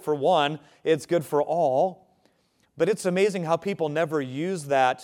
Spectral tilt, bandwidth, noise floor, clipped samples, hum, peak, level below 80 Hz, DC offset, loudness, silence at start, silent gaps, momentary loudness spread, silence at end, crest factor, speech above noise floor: -5.5 dB/octave; 17.5 kHz; -67 dBFS; under 0.1%; none; -8 dBFS; -74 dBFS; under 0.1%; -25 LUFS; 0 s; none; 6 LU; 0 s; 18 dB; 43 dB